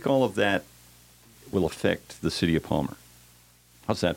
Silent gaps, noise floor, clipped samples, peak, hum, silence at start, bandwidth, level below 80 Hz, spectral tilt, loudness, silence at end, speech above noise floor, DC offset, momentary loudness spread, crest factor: none; -57 dBFS; under 0.1%; -8 dBFS; 60 Hz at -50 dBFS; 0 s; 17 kHz; -52 dBFS; -5.5 dB/octave; -27 LUFS; 0 s; 31 dB; under 0.1%; 10 LU; 20 dB